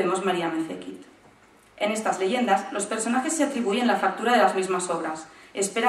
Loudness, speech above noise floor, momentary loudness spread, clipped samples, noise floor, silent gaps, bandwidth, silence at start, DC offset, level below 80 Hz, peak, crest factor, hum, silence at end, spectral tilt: -25 LUFS; 31 dB; 13 LU; under 0.1%; -55 dBFS; none; 13.5 kHz; 0 s; under 0.1%; -70 dBFS; -6 dBFS; 18 dB; none; 0 s; -3.5 dB/octave